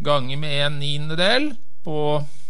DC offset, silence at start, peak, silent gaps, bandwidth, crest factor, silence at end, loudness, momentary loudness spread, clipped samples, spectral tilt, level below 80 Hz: 10%; 0 s; -4 dBFS; none; 11.5 kHz; 18 dB; 0.2 s; -22 LUFS; 11 LU; under 0.1%; -5 dB/octave; -64 dBFS